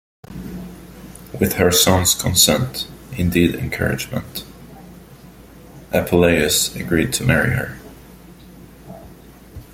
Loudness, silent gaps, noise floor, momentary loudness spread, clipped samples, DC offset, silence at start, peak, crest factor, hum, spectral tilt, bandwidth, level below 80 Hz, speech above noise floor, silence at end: -17 LUFS; none; -42 dBFS; 25 LU; under 0.1%; under 0.1%; 0.3 s; 0 dBFS; 20 dB; none; -3.5 dB/octave; 16.5 kHz; -42 dBFS; 25 dB; 0.1 s